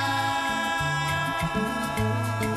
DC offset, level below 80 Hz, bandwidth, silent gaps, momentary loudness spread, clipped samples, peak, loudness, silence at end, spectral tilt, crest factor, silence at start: under 0.1%; -46 dBFS; 15 kHz; none; 2 LU; under 0.1%; -14 dBFS; -26 LUFS; 0 s; -4.5 dB/octave; 12 dB; 0 s